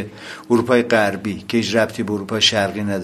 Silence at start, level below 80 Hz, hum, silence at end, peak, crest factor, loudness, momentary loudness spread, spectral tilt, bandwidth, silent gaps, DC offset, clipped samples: 0 s; -50 dBFS; none; 0 s; 0 dBFS; 18 dB; -18 LUFS; 10 LU; -4 dB/octave; 15.5 kHz; none; under 0.1%; under 0.1%